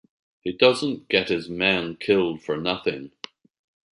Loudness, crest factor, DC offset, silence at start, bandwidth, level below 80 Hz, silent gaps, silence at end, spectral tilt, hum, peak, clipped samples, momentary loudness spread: -23 LUFS; 20 dB; under 0.1%; 0.45 s; 11 kHz; -58 dBFS; none; 0.9 s; -5 dB/octave; none; -4 dBFS; under 0.1%; 16 LU